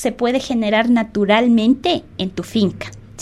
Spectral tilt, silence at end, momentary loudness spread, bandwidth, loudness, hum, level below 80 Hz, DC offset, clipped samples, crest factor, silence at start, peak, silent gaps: -5.5 dB/octave; 0 s; 11 LU; 12.5 kHz; -17 LUFS; none; -46 dBFS; under 0.1%; under 0.1%; 16 dB; 0 s; -2 dBFS; none